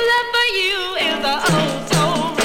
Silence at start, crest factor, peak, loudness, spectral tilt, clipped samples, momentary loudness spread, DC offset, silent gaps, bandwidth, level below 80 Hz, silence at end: 0 s; 14 dB; -4 dBFS; -17 LUFS; -3.5 dB/octave; under 0.1%; 3 LU; under 0.1%; none; 18.5 kHz; -46 dBFS; 0 s